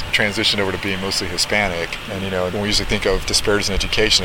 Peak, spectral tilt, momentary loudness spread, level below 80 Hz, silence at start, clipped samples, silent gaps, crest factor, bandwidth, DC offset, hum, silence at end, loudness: -2 dBFS; -2.5 dB/octave; 6 LU; -32 dBFS; 0 s; under 0.1%; none; 18 dB; 18 kHz; under 0.1%; none; 0 s; -19 LUFS